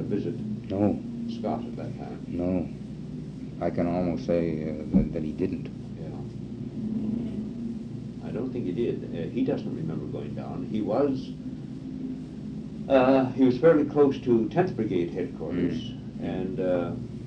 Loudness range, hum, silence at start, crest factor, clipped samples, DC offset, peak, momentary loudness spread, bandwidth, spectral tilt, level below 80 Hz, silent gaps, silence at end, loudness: 8 LU; none; 0 s; 20 dB; under 0.1%; under 0.1%; -8 dBFS; 15 LU; 8.4 kHz; -9 dB/octave; -50 dBFS; none; 0 s; -28 LUFS